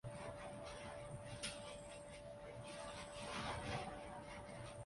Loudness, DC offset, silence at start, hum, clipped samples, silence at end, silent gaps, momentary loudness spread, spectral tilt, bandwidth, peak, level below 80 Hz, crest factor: -50 LUFS; under 0.1%; 0.05 s; none; under 0.1%; 0 s; none; 8 LU; -4 dB/octave; 11.5 kHz; -32 dBFS; -64 dBFS; 18 dB